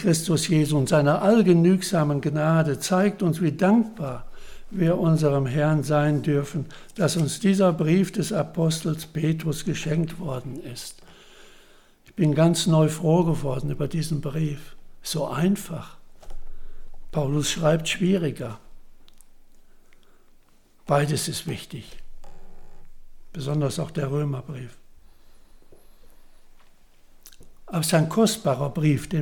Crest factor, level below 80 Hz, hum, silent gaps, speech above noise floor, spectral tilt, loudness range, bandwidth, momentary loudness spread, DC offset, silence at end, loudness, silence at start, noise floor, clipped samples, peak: 18 dB; -44 dBFS; none; none; 31 dB; -6 dB/octave; 10 LU; 18.5 kHz; 16 LU; under 0.1%; 0 s; -23 LUFS; 0 s; -54 dBFS; under 0.1%; -6 dBFS